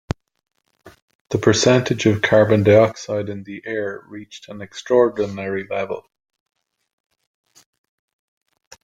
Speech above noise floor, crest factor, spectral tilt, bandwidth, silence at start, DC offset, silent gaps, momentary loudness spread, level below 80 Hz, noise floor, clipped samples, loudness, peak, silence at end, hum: 31 dB; 20 dB; -5.5 dB/octave; 9.4 kHz; 0.1 s; under 0.1%; 1.02-1.08 s, 1.15-1.25 s; 20 LU; -54 dBFS; -49 dBFS; under 0.1%; -18 LUFS; -2 dBFS; 2.85 s; none